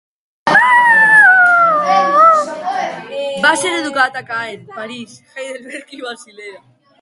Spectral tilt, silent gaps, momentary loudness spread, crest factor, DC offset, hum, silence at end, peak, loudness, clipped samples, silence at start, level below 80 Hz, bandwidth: -2.5 dB/octave; none; 22 LU; 14 dB; under 0.1%; none; 0.45 s; 0 dBFS; -11 LUFS; under 0.1%; 0.45 s; -66 dBFS; 11.5 kHz